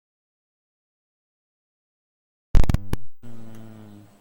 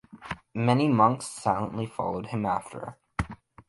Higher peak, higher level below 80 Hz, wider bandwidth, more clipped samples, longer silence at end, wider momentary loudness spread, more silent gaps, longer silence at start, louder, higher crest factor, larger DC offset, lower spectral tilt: first, -2 dBFS vs -8 dBFS; first, -28 dBFS vs -50 dBFS; second, 10 kHz vs 11.5 kHz; neither; first, 0.5 s vs 0.35 s; first, 22 LU vs 17 LU; neither; first, 2.55 s vs 0.15 s; about the same, -27 LUFS vs -27 LUFS; about the same, 20 dB vs 20 dB; neither; about the same, -7 dB/octave vs -6.5 dB/octave